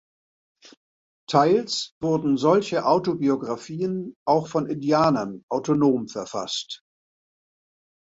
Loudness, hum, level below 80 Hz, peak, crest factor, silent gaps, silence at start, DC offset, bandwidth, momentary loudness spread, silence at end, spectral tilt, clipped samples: -23 LUFS; none; -64 dBFS; -4 dBFS; 20 dB; 1.92-2.01 s, 4.16-4.26 s, 5.43-5.48 s; 1.3 s; under 0.1%; 8 kHz; 9 LU; 1.35 s; -5.5 dB/octave; under 0.1%